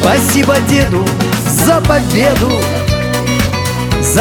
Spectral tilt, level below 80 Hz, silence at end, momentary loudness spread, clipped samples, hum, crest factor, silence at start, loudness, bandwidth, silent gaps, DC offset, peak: -4.5 dB/octave; -26 dBFS; 0 s; 4 LU; under 0.1%; none; 10 dB; 0 s; -12 LUFS; 19.5 kHz; none; under 0.1%; 0 dBFS